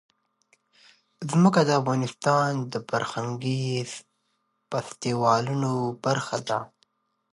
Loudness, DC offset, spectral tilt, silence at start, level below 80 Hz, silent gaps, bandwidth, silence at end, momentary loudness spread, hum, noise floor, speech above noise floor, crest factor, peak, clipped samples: -25 LUFS; under 0.1%; -6 dB/octave; 1.2 s; -68 dBFS; none; 11.5 kHz; 0.65 s; 11 LU; none; -74 dBFS; 49 dB; 20 dB; -6 dBFS; under 0.1%